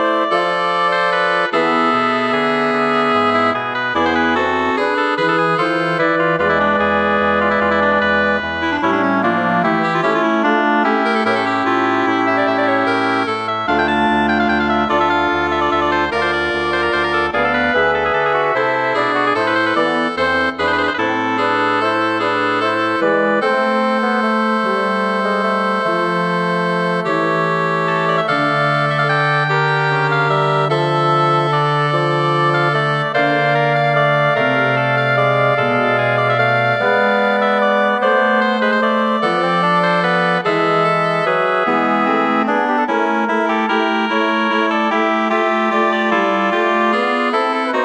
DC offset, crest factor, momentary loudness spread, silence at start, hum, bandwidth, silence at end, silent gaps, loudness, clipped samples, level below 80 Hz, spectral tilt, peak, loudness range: under 0.1%; 12 dB; 2 LU; 0 s; none; 10.5 kHz; 0 s; none; -15 LUFS; under 0.1%; -48 dBFS; -6 dB/octave; -2 dBFS; 1 LU